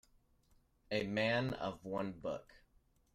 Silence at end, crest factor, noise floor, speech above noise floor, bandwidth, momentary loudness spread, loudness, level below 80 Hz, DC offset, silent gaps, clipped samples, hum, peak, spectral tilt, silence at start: 0.55 s; 20 dB; -72 dBFS; 34 dB; 14.5 kHz; 10 LU; -39 LUFS; -68 dBFS; under 0.1%; none; under 0.1%; none; -22 dBFS; -6 dB/octave; 0.9 s